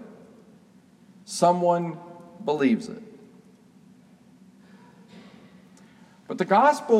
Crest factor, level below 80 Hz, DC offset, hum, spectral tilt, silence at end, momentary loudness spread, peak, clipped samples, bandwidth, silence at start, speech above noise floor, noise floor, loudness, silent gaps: 20 dB; -78 dBFS; under 0.1%; none; -5.5 dB/octave; 0 s; 24 LU; -8 dBFS; under 0.1%; 14.5 kHz; 0 s; 33 dB; -55 dBFS; -23 LUFS; none